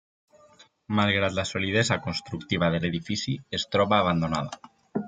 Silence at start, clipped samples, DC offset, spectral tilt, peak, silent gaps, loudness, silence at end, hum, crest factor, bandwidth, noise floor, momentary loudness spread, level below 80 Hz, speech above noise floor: 0.9 s; under 0.1%; under 0.1%; -5 dB/octave; -6 dBFS; none; -26 LUFS; 0 s; none; 22 dB; 9.4 kHz; -57 dBFS; 9 LU; -58 dBFS; 31 dB